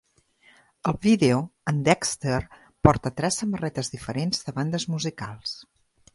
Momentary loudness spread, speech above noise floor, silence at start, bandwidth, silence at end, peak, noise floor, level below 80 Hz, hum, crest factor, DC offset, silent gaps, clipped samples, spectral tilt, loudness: 12 LU; 36 dB; 0.85 s; 11.5 kHz; 0.55 s; 0 dBFS; -60 dBFS; -46 dBFS; none; 26 dB; under 0.1%; none; under 0.1%; -5 dB/octave; -25 LUFS